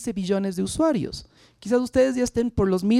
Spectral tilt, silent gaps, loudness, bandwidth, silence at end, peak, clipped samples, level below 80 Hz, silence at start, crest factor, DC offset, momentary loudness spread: -6 dB/octave; none; -23 LUFS; 13.5 kHz; 0 s; -8 dBFS; under 0.1%; -44 dBFS; 0 s; 16 dB; under 0.1%; 10 LU